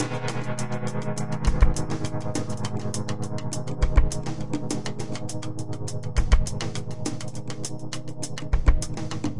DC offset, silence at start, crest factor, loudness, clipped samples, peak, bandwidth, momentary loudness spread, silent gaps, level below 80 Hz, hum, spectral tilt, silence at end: 3%; 0 s; 20 dB; -29 LUFS; under 0.1%; -4 dBFS; 11.5 kHz; 9 LU; none; -28 dBFS; none; -5.5 dB/octave; 0 s